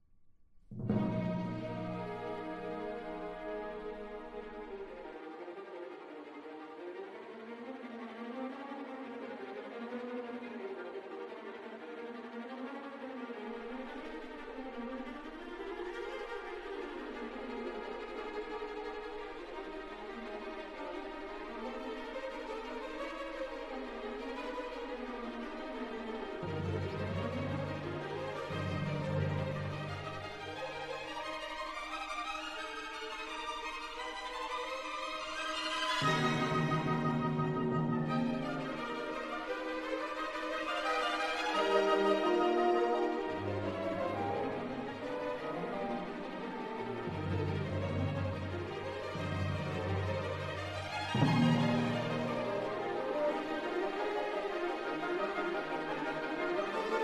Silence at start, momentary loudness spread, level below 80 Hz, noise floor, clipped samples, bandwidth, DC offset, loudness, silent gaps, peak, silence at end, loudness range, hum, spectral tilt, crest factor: 0.1 s; 13 LU; -62 dBFS; -62 dBFS; under 0.1%; 12 kHz; under 0.1%; -38 LUFS; none; -16 dBFS; 0 s; 11 LU; none; -6 dB/octave; 20 dB